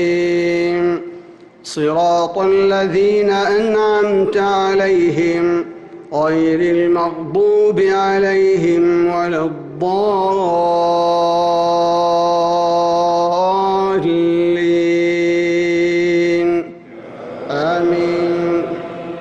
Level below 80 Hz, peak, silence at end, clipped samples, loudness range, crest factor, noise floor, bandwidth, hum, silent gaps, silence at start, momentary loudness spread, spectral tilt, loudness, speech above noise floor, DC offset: -52 dBFS; -6 dBFS; 0 s; under 0.1%; 2 LU; 8 dB; -38 dBFS; 8.8 kHz; none; none; 0 s; 8 LU; -6 dB/octave; -15 LUFS; 24 dB; under 0.1%